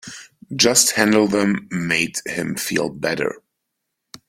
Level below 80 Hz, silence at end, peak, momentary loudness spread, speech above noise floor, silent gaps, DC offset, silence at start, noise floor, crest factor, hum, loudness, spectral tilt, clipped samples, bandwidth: -58 dBFS; 0.9 s; 0 dBFS; 17 LU; 59 dB; none; under 0.1%; 0.05 s; -78 dBFS; 20 dB; none; -18 LUFS; -3 dB/octave; under 0.1%; 16.5 kHz